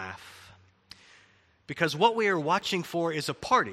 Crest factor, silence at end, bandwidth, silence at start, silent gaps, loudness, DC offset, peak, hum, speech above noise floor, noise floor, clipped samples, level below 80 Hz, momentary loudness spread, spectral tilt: 22 dB; 0 s; 15.5 kHz; 0 s; none; -27 LUFS; under 0.1%; -8 dBFS; none; 35 dB; -62 dBFS; under 0.1%; -66 dBFS; 17 LU; -4.5 dB/octave